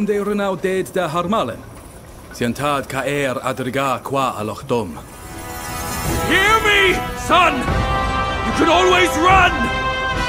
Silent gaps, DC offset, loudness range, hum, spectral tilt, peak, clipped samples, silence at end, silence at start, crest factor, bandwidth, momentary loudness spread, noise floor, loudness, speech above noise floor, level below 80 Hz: none; under 0.1%; 7 LU; none; -4 dB/octave; 0 dBFS; under 0.1%; 0 s; 0 s; 18 dB; 16 kHz; 14 LU; -38 dBFS; -17 LUFS; 20 dB; -32 dBFS